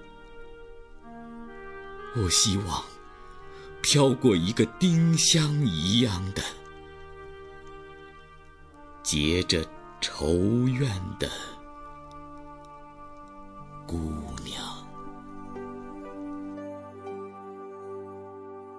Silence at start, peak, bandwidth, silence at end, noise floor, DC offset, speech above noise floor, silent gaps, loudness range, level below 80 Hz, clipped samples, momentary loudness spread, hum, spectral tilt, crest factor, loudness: 0 s; -10 dBFS; 11 kHz; 0 s; -50 dBFS; under 0.1%; 25 dB; none; 16 LU; -48 dBFS; under 0.1%; 25 LU; none; -4 dB/octave; 20 dB; -26 LUFS